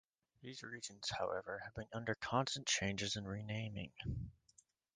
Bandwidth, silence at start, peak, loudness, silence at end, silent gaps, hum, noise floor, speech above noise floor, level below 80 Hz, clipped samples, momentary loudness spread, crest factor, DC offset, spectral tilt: 10 kHz; 0.4 s; -20 dBFS; -42 LUFS; 0.65 s; none; none; -73 dBFS; 30 dB; -62 dBFS; under 0.1%; 12 LU; 22 dB; under 0.1%; -3.5 dB/octave